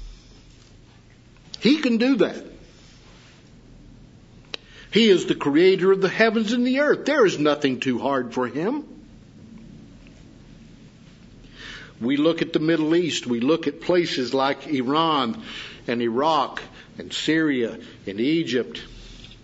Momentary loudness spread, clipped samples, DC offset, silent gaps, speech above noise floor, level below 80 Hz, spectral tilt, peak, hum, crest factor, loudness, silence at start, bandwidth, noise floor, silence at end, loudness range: 19 LU; under 0.1%; under 0.1%; none; 29 dB; -54 dBFS; -5 dB/octave; -2 dBFS; none; 22 dB; -22 LUFS; 0 s; 8 kHz; -50 dBFS; 0.1 s; 9 LU